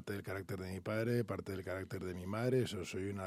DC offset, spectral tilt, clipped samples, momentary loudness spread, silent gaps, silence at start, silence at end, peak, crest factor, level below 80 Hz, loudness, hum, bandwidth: under 0.1%; -6.5 dB/octave; under 0.1%; 8 LU; none; 0 s; 0 s; -22 dBFS; 18 dB; -74 dBFS; -40 LUFS; none; 15 kHz